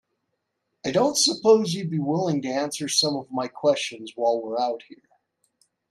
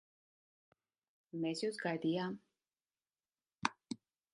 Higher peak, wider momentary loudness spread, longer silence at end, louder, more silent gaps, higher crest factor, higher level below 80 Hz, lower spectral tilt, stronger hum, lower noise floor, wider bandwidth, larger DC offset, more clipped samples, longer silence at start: first, -6 dBFS vs -14 dBFS; second, 10 LU vs 13 LU; first, 0.95 s vs 0.4 s; first, -23 LUFS vs -40 LUFS; neither; second, 18 dB vs 30 dB; first, -72 dBFS vs -84 dBFS; second, -3.5 dB/octave vs -5 dB/octave; neither; second, -78 dBFS vs under -90 dBFS; first, 13.5 kHz vs 11 kHz; neither; neither; second, 0.85 s vs 1.35 s